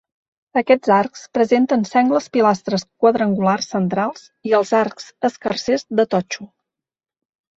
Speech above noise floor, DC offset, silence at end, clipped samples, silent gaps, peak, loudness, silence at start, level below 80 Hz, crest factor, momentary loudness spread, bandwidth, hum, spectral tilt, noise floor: 70 dB; under 0.1%; 1.1 s; under 0.1%; none; -2 dBFS; -18 LUFS; 0.55 s; -62 dBFS; 16 dB; 8 LU; 8 kHz; none; -5.5 dB/octave; -88 dBFS